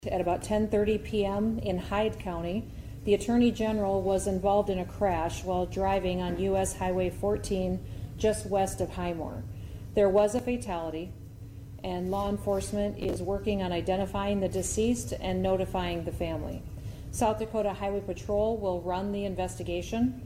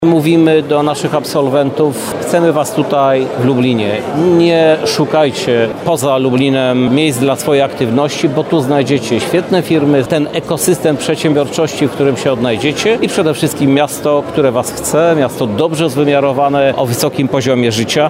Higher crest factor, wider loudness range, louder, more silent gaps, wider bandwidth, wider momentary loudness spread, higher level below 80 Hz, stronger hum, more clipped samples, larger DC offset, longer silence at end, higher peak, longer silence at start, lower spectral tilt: about the same, 16 dB vs 12 dB; about the same, 3 LU vs 1 LU; second, -30 LUFS vs -12 LUFS; neither; about the same, 16 kHz vs 16.5 kHz; first, 10 LU vs 4 LU; about the same, -44 dBFS vs -48 dBFS; neither; neither; neither; about the same, 0 s vs 0 s; second, -12 dBFS vs 0 dBFS; about the same, 0 s vs 0 s; about the same, -6 dB/octave vs -5.5 dB/octave